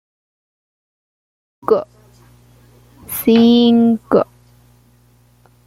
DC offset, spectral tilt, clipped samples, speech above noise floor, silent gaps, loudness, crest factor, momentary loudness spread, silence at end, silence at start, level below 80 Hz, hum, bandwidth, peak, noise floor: under 0.1%; -5.5 dB/octave; under 0.1%; 40 dB; none; -14 LUFS; 16 dB; 16 LU; 1.45 s; 1.7 s; -54 dBFS; 60 Hz at -35 dBFS; 16.5 kHz; -2 dBFS; -52 dBFS